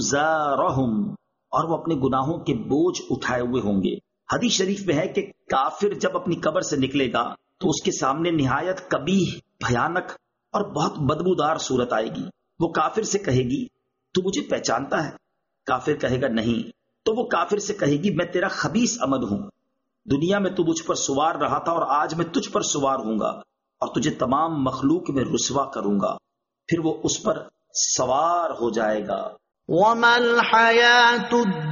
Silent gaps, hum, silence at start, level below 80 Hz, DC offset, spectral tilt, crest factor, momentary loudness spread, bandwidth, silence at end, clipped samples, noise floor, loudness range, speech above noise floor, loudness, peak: none; none; 0 s; -54 dBFS; under 0.1%; -3.5 dB/octave; 18 dB; 8 LU; 7.4 kHz; 0 s; under 0.1%; -69 dBFS; 3 LU; 47 dB; -23 LUFS; -4 dBFS